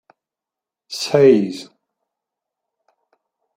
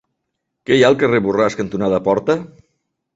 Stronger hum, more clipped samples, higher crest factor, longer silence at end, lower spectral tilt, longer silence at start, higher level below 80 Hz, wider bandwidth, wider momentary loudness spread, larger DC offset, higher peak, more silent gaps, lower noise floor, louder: neither; neither; about the same, 20 dB vs 16 dB; first, 1.95 s vs 0.7 s; about the same, -5.5 dB/octave vs -6 dB/octave; first, 0.9 s vs 0.7 s; second, -64 dBFS vs -52 dBFS; first, 15 kHz vs 7.8 kHz; first, 19 LU vs 8 LU; neither; about the same, 0 dBFS vs -2 dBFS; neither; first, -87 dBFS vs -76 dBFS; about the same, -16 LUFS vs -16 LUFS